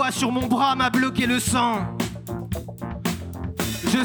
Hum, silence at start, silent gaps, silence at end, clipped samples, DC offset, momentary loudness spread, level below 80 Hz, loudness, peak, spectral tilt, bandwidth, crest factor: none; 0 s; none; 0 s; under 0.1%; under 0.1%; 11 LU; -42 dBFS; -23 LUFS; -8 dBFS; -4 dB/octave; over 20 kHz; 16 dB